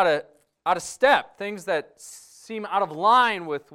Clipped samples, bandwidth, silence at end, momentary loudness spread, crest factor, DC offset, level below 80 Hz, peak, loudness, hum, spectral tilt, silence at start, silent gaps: under 0.1%; 16 kHz; 0 s; 22 LU; 18 dB; under 0.1%; -66 dBFS; -6 dBFS; -23 LUFS; none; -3 dB/octave; 0 s; none